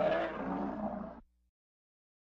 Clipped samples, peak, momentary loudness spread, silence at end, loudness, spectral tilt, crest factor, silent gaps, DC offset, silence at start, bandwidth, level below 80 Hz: under 0.1%; -22 dBFS; 14 LU; 1 s; -37 LUFS; -8 dB/octave; 16 dB; none; under 0.1%; 0 s; 7.2 kHz; -60 dBFS